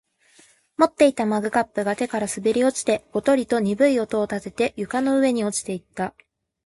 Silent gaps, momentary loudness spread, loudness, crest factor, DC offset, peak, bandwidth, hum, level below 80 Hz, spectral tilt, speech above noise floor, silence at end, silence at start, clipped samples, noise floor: none; 9 LU; -22 LUFS; 20 dB; under 0.1%; -2 dBFS; 11.5 kHz; none; -60 dBFS; -4.5 dB/octave; 35 dB; 0.55 s; 0.8 s; under 0.1%; -56 dBFS